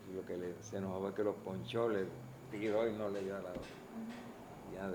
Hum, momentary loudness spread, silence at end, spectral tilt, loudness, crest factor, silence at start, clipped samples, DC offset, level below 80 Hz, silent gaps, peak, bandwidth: none; 13 LU; 0 s; -6.5 dB/octave; -41 LUFS; 18 dB; 0 s; under 0.1%; under 0.1%; -68 dBFS; none; -24 dBFS; over 20 kHz